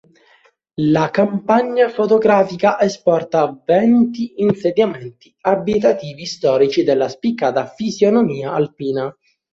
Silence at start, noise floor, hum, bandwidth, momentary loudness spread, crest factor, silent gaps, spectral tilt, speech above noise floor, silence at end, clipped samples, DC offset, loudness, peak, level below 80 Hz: 0.8 s; -55 dBFS; none; 7.6 kHz; 8 LU; 16 dB; none; -6.5 dB/octave; 39 dB; 0.45 s; under 0.1%; under 0.1%; -17 LUFS; 0 dBFS; -58 dBFS